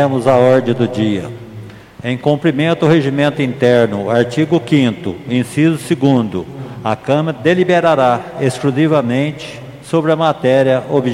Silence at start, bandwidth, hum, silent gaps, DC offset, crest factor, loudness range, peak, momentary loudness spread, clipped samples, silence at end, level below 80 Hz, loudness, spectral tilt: 0 s; 14.5 kHz; none; none; under 0.1%; 14 dB; 2 LU; 0 dBFS; 12 LU; under 0.1%; 0 s; -52 dBFS; -14 LUFS; -7 dB/octave